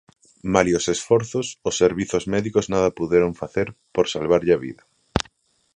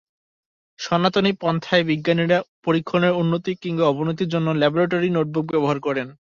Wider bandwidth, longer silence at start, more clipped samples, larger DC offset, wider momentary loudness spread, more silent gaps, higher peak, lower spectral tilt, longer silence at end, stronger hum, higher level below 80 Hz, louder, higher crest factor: first, 10 kHz vs 7.2 kHz; second, 0.45 s vs 0.8 s; neither; neither; first, 8 LU vs 5 LU; second, none vs 2.49-2.63 s; about the same, 0 dBFS vs -2 dBFS; second, -5 dB/octave vs -6.5 dB/octave; first, 0.55 s vs 0.25 s; neither; first, -46 dBFS vs -60 dBFS; about the same, -22 LUFS vs -21 LUFS; about the same, 22 dB vs 18 dB